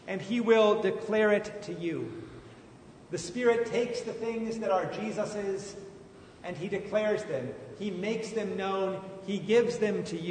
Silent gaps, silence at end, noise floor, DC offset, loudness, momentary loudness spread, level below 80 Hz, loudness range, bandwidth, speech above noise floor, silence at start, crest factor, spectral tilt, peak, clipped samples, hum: none; 0 s; -52 dBFS; under 0.1%; -30 LUFS; 15 LU; -66 dBFS; 5 LU; 9.6 kHz; 22 dB; 0 s; 20 dB; -5.5 dB/octave; -10 dBFS; under 0.1%; none